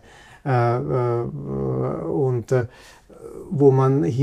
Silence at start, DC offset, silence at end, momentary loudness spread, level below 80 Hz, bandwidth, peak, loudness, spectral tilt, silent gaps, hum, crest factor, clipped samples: 0.45 s; under 0.1%; 0 s; 15 LU; -50 dBFS; 9.4 kHz; -4 dBFS; -21 LUFS; -9 dB/octave; none; none; 18 dB; under 0.1%